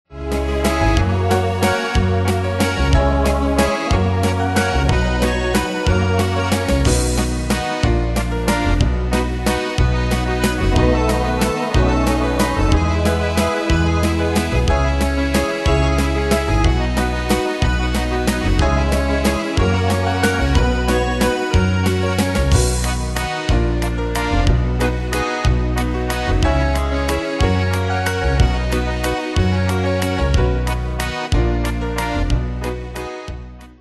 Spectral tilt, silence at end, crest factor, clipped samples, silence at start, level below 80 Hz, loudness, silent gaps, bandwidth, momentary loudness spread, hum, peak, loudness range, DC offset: -5.5 dB/octave; 0.1 s; 16 dB; under 0.1%; 0.1 s; -22 dBFS; -18 LUFS; none; 12.5 kHz; 4 LU; none; -2 dBFS; 2 LU; under 0.1%